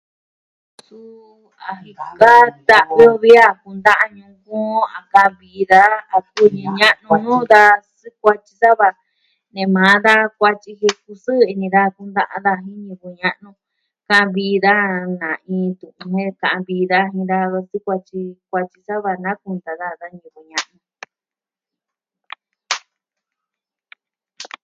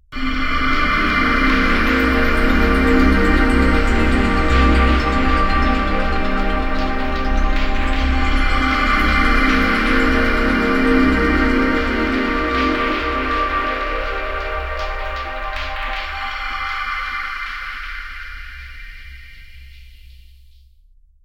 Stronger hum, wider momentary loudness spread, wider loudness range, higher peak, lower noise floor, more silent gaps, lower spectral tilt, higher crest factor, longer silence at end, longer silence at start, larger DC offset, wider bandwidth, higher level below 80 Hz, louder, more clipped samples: neither; first, 19 LU vs 10 LU; first, 18 LU vs 11 LU; about the same, 0 dBFS vs -2 dBFS; first, under -90 dBFS vs -50 dBFS; neither; about the same, -5 dB/octave vs -6 dB/octave; about the same, 16 dB vs 16 dB; second, 0.2 s vs 1.1 s; first, 1.05 s vs 0.1 s; neither; second, 12 kHz vs 15 kHz; second, -62 dBFS vs -22 dBFS; first, -15 LUFS vs -18 LUFS; first, 0.3% vs under 0.1%